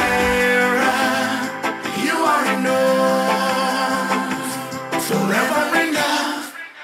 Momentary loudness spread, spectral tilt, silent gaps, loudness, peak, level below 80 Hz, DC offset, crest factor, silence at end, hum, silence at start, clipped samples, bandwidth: 8 LU; -3.5 dB/octave; none; -18 LUFS; -4 dBFS; -48 dBFS; under 0.1%; 14 dB; 0 s; none; 0 s; under 0.1%; 16 kHz